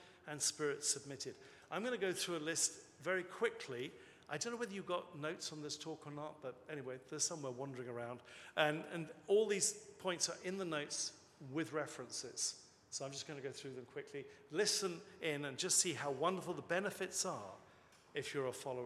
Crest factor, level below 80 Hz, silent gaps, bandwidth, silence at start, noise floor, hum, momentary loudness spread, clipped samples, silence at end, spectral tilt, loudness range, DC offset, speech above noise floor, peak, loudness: 24 dB; -86 dBFS; none; 14.5 kHz; 0 s; -66 dBFS; none; 13 LU; under 0.1%; 0 s; -2.5 dB/octave; 6 LU; under 0.1%; 24 dB; -18 dBFS; -41 LUFS